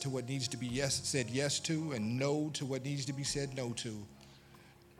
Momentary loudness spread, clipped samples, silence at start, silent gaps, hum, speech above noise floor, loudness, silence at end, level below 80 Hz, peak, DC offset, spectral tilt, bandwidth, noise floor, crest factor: 6 LU; under 0.1%; 0 s; none; none; 23 dB; -36 LUFS; 0.05 s; -64 dBFS; -16 dBFS; under 0.1%; -4 dB/octave; 15.5 kHz; -59 dBFS; 20 dB